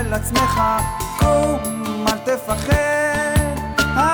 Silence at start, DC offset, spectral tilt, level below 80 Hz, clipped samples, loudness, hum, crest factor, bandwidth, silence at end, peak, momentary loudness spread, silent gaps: 0 s; under 0.1%; -4.5 dB/octave; -28 dBFS; under 0.1%; -19 LUFS; none; 12 dB; over 20 kHz; 0 s; -6 dBFS; 5 LU; none